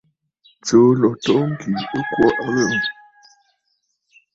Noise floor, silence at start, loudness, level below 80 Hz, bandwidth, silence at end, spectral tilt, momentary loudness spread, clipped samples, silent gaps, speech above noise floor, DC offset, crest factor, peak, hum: -70 dBFS; 0.65 s; -18 LUFS; -56 dBFS; 7.8 kHz; 1.4 s; -5.5 dB/octave; 10 LU; under 0.1%; none; 53 dB; under 0.1%; 18 dB; -2 dBFS; none